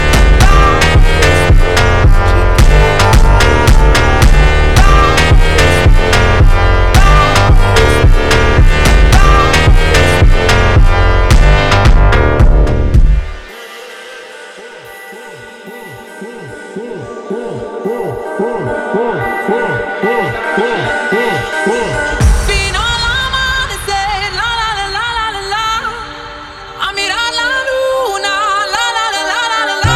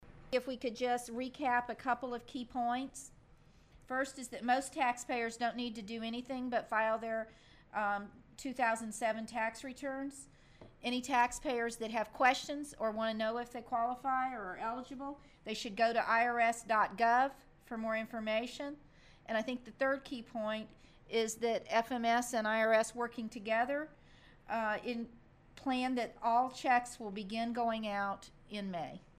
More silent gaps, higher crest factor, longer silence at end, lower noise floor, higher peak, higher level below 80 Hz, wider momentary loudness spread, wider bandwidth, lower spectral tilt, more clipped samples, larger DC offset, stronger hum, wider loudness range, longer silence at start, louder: neither; second, 10 dB vs 20 dB; second, 0 s vs 0.15 s; second, -31 dBFS vs -63 dBFS; first, 0 dBFS vs -18 dBFS; first, -12 dBFS vs -66 dBFS; first, 19 LU vs 12 LU; second, 14 kHz vs 15.5 kHz; first, -5 dB/octave vs -3.5 dB/octave; neither; neither; neither; first, 12 LU vs 5 LU; about the same, 0 s vs 0 s; first, -11 LUFS vs -36 LUFS